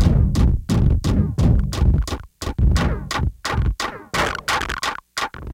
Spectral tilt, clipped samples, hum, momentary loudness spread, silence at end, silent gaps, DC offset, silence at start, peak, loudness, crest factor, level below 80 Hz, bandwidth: -5.5 dB/octave; under 0.1%; none; 8 LU; 0 s; none; under 0.1%; 0 s; -4 dBFS; -21 LUFS; 16 dB; -22 dBFS; 16 kHz